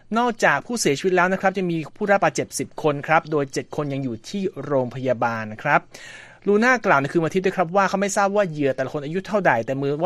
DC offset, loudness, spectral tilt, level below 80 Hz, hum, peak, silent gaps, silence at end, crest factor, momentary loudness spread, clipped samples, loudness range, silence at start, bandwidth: under 0.1%; -21 LUFS; -5 dB/octave; -58 dBFS; none; -2 dBFS; none; 0 s; 20 dB; 9 LU; under 0.1%; 3 LU; 0.1 s; 13.5 kHz